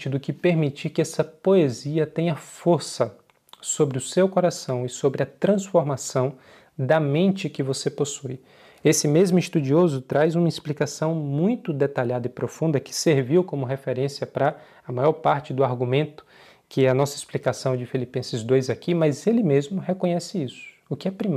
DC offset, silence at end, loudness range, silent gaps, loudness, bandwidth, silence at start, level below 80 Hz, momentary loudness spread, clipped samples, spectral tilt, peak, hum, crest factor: under 0.1%; 0 s; 2 LU; none; -23 LUFS; 15 kHz; 0 s; -70 dBFS; 9 LU; under 0.1%; -6 dB/octave; -6 dBFS; none; 16 dB